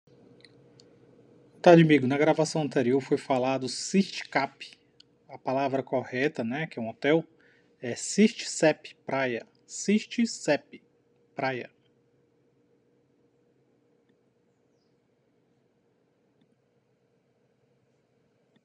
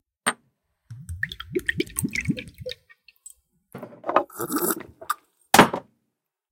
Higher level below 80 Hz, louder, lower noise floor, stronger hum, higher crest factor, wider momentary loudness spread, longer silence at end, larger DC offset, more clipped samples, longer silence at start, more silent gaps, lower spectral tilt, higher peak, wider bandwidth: second, -80 dBFS vs -52 dBFS; about the same, -26 LUFS vs -24 LUFS; second, -70 dBFS vs -80 dBFS; neither; about the same, 26 dB vs 28 dB; second, 15 LU vs 24 LU; first, 7 s vs 0.7 s; neither; neither; first, 1.65 s vs 0.25 s; neither; first, -5.5 dB/octave vs -3.5 dB/octave; second, -4 dBFS vs 0 dBFS; second, 11 kHz vs 17 kHz